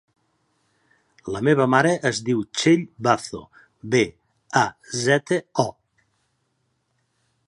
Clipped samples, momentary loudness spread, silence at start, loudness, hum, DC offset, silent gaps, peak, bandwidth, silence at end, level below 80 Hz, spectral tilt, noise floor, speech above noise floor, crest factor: under 0.1%; 12 LU; 1.25 s; -22 LUFS; none; under 0.1%; none; -2 dBFS; 11.5 kHz; 1.75 s; -60 dBFS; -5 dB/octave; -71 dBFS; 50 dB; 22 dB